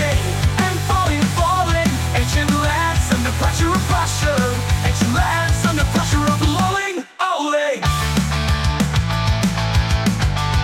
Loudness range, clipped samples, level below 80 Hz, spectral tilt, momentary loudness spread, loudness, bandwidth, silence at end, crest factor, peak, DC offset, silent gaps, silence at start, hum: 1 LU; under 0.1%; -26 dBFS; -5 dB/octave; 2 LU; -18 LUFS; 17 kHz; 0 s; 12 dB; -6 dBFS; under 0.1%; none; 0 s; none